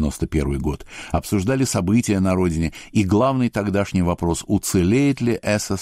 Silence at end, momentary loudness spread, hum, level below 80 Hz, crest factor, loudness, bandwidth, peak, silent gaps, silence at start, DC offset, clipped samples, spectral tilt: 0 s; 7 LU; none; -36 dBFS; 12 dB; -20 LUFS; 15.5 kHz; -8 dBFS; none; 0 s; under 0.1%; under 0.1%; -6 dB/octave